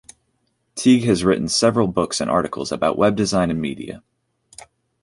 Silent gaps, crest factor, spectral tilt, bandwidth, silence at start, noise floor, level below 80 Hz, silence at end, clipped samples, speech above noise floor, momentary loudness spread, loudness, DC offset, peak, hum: none; 18 dB; -5 dB/octave; 11.5 kHz; 0.75 s; -69 dBFS; -48 dBFS; 1.05 s; under 0.1%; 50 dB; 14 LU; -19 LUFS; under 0.1%; -4 dBFS; none